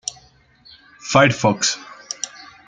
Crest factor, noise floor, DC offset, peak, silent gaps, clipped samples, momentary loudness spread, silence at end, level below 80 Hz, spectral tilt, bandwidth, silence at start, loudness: 20 dB; -52 dBFS; under 0.1%; -2 dBFS; none; under 0.1%; 16 LU; 0.4 s; -54 dBFS; -3.5 dB/octave; 9.6 kHz; 0.05 s; -18 LUFS